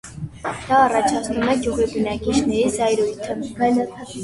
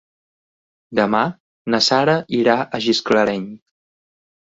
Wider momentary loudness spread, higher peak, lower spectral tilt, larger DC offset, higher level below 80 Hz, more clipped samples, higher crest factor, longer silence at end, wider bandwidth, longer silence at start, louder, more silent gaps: about the same, 12 LU vs 10 LU; about the same, -4 dBFS vs -2 dBFS; about the same, -4.5 dB/octave vs -4.5 dB/octave; neither; first, -44 dBFS vs -60 dBFS; neither; about the same, 16 dB vs 18 dB; second, 0 s vs 0.95 s; first, 11.5 kHz vs 8 kHz; second, 0.05 s vs 0.9 s; about the same, -20 LUFS vs -18 LUFS; second, none vs 1.40-1.65 s